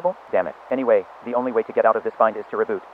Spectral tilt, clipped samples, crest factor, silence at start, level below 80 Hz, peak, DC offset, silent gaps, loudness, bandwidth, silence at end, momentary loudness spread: -8 dB/octave; under 0.1%; 18 dB; 0 s; -70 dBFS; -2 dBFS; under 0.1%; none; -22 LUFS; 5.2 kHz; 0 s; 6 LU